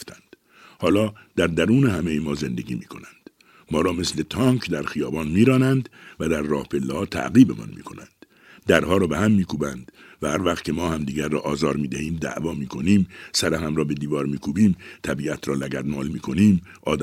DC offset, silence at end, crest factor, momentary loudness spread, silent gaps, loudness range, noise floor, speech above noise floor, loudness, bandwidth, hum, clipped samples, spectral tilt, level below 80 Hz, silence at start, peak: under 0.1%; 0 s; 22 dB; 11 LU; none; 3 LU; -51 dBFS; 29 dB; -23 LUFS; 15.5 kHz; none; under 0.1%; -6 dB/octave; -46 dBFS; 0 s; 0 dBFS